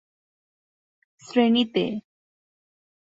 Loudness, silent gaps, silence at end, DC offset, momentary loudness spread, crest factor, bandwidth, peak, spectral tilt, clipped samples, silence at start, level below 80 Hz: -23 LUFS; none; 1.15 s; under 0.1%; 10 LU; 20 dB; 7.8 kHz; -8 dBFS; -6 dB/octave; under 0.1%; 1.3 s; -70 dBFS